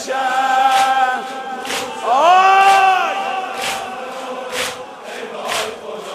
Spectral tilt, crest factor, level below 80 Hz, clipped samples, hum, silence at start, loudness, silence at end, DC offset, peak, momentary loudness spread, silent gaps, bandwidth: -1 dB/octave; 16 dB; -64 dBFS; under 0.1%; none; 0 s; -16 LUFS; 0 s; under 0.1%; 0 dBFS; 17 LU; none; 15 kHz